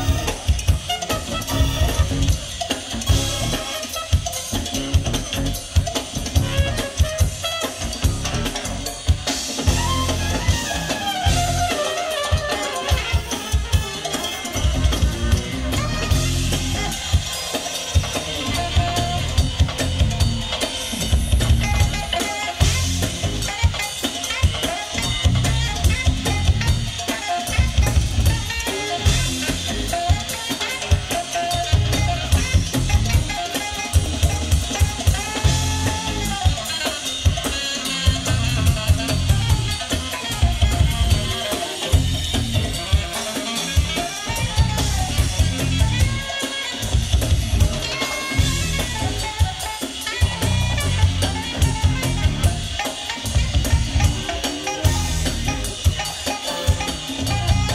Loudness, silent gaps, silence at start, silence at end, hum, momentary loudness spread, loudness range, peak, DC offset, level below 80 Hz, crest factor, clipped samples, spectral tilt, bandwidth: -21 LUFS; none; 0 s; 0 s; none; 5 LU; 2 LU; -4 dBFS; under 0.1%; -26 dBFS; 16 dB; under 0.1%; -4 dB/octave; 16 kHz